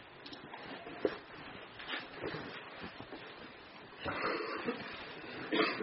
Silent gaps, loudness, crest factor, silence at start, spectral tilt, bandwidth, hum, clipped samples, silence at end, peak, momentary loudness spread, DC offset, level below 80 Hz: none; -41 LUFS; 24 dB; 0 s; -2 dB/octave; 5.8 kHz; none; under 0.1%; 0 s; -18 dBFS; 13 LU; under 0.1%; -70 dBFS